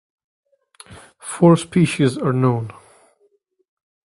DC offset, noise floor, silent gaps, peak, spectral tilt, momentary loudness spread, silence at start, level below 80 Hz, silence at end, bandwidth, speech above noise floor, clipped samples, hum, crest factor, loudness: under 0.1%; -62 dBFS; none; 0 dBFS; -6.5 dB/octave; 18 LU; 0.9 s; -56 dBFS; 1.4 s; 11.5 kHz; 46 dB; under 0.1%; none; 20 dB; -17 LUFS